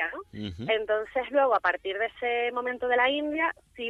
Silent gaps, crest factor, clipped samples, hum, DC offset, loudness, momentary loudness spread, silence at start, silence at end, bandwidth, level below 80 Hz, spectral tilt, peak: none; 18 dB; under 0.1%; none; under 0.1%; -27 LUFS; 8 LU; 0 s; 0 s; 6.8 kHz; -60 dBFS; -6 dB/octave; -10 dBFS